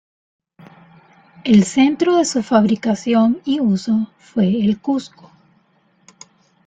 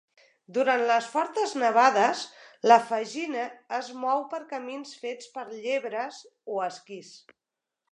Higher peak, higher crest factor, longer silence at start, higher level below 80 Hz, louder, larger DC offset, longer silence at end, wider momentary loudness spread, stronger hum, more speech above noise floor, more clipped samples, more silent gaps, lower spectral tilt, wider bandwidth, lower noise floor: about the same, -2 dBFS vs -4 dBFS; second, 16 dB vs 24 dB; first, 1.45 s vs 0.5 s; first, -58 dBFS vs -88 dBFS; first, -17 LUFS vs -26 LUFS; neither; first, 1.6 s vs 0.75 s; second, 7 LU vs 18 LU; neither; second, 43 dB vs 61 dB; neither; neither; first, -6 dB/octave vs -3 dB/octave; second, 9.2 kHz vs 10.5 kHz; second, -59 dBFS vs -88 dBFS